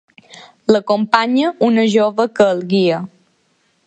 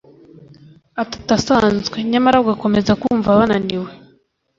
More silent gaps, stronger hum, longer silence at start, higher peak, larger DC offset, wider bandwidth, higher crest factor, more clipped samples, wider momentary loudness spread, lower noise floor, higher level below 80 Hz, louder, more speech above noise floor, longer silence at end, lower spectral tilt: neither; neither; second, 0.35 s vs 0.95 s; about the same, 0 dBFS vs -2 dBFS; neither; first, 8.8 kHz vs 7.6 kHz; about the same, 16 dB vs 16 dB; neither; second, 6 LU vs 12 LU; first, -61 dBFS vs -57 dBFS; second, -62 dBFS vs -44 dBFS; about the same, -15 LUFS vs -16 LUFS; first, 47 dB vs 41 dB; first, 0.8 s vs 0.6 s; about the same, -6 dB/octave vs -5.5 dB/octave